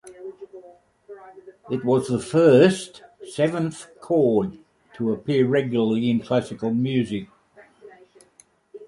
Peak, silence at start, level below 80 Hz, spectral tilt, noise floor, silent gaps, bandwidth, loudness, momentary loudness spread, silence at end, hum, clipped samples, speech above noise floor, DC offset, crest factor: -2 dBFS; 0.05 s; -60 dBFS; -6.5 dB/octave; -58 dBFS; none; 11.5 kHz; -22 LUFS; 23 LU; 0.05 s; none; under 0.1%; 37 dB; under 0.1%; 20 dB